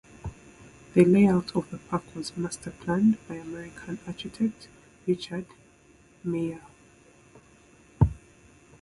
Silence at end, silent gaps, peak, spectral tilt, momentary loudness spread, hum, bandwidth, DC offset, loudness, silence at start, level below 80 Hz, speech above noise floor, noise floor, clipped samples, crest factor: 0.65 s; none; -6 dBFS; -7 dB/octave; 21 LU; none; 11.5 kHz; under 0.1%; -27 LUFS; 0.25 s; -46 dBFS; 31 dB; -57 dBFS; under 0.1%; 22 dB